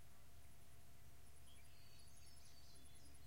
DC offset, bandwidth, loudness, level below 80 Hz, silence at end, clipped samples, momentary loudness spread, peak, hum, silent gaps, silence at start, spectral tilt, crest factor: 0.2%; 16 kHz; -66 LUFS; -70 dBFS; 0 s; under 0.1%; 3 LU; -48 dBFS; none; none; 0 s; -3 dB/octave; 14 dB